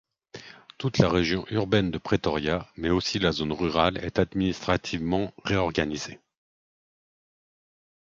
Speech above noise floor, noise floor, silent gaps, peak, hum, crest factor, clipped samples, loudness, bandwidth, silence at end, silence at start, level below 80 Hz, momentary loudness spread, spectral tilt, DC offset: 21 dB; -47 dBFS; none; -2 dBFS; none; 26 dB; under 0.1%; -26 LUFS; 7.6 kHz; 2.05 s; 0.35 s; -46 dBFS; 7 LU; -5.5 dB/octave; under 0.1%